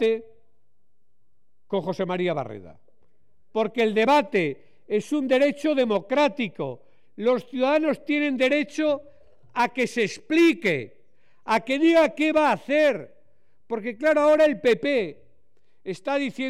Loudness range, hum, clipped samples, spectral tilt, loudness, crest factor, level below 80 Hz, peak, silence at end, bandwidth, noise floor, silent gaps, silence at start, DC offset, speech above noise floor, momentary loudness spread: 4 LU; none; under 0.1%; -5.5 dB/octave; -23 LUFS; 12 dB; -66 dBFS; -12 dBFS; 0 s; 14 kHz; -77 dBFS; none; 0 s; 0.4%; 55 dB; 14 LU